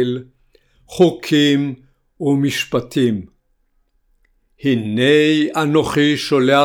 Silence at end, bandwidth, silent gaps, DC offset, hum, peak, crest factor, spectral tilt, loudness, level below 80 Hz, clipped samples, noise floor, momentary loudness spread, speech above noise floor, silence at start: 0 s; 17 kHz; none; under 0.1%; none; 0 dBFS; 16 dB; -5.5 dB/octave; -16 LUFS; -52 dBFS; under 0.1%; -62 dBFS; 11 LU; 47 dB; 0 s